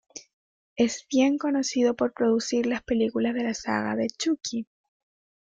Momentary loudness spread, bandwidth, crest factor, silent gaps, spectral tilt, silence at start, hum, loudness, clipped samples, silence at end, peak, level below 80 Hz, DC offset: 11 LU; 9.2 kHz; 16 dB; 0.33-0.76 s; -4 dB/octave; 0.15 s; none; -26 LUFS; under 0.1%; 0.8 s; -10 dBFS; -60 dBFS; under 0.1%